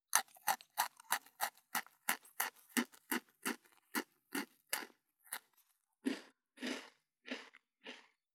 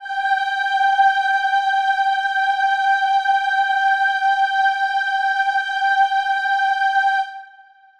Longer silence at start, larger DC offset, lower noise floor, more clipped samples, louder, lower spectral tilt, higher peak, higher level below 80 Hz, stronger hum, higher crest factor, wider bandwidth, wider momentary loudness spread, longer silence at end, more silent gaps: first, 0.15 s vs 0 s; neither; first, -77 dBFS vs -48 dBFS; neither; second, -42 LUFS vs -18 LUFS; first, -0.5 dB/octave vs 3.5 dB/octave; second, -8 dBFS vs -4 dBFS; second, under -90 dBFS vs -68 dBFS; neither; first, 36 dB vs 14 dB; first, over 20 kHz vs 9.2 kHz; first, 16 LU vs 3 LU; second, 0.35 s vs 0.55 s; neither